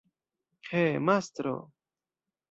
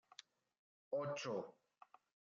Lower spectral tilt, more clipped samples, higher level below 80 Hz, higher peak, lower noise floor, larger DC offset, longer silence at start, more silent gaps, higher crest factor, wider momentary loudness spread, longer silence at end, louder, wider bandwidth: first, -6.5 dB/octave vs -4 dB/octave; neither; first, -72 dBFS vs under -90 dBFS; first, -12 dBFS vs -32 dBFS; first, under -90 dBFS vs -65 dBFS; neither; second, 0.65 s vs 0.9 s; neither; first, 22 dB vs 16 dB; second, 13 LU vs 24 LU; about the same, 0.85 s vs 0.85 s; first, -29 LUFS vs -45 LUFS; about the same, 8 kHz vs 7.4 kHz